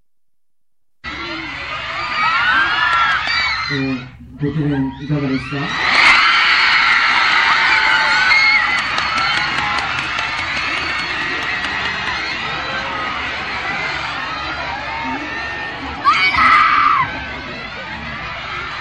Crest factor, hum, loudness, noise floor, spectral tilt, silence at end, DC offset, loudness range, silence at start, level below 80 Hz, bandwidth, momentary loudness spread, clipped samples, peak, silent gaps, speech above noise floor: 16 dB; none; -15 LUFS; -82 dBFS; -3.5 dB/octave; 0 s; 0.2%; 9 LU; 1.05 s; -42 dBFS; 11.5 kHz; 14 LU; under 0.1%; 0 dBFS; none; 62 dB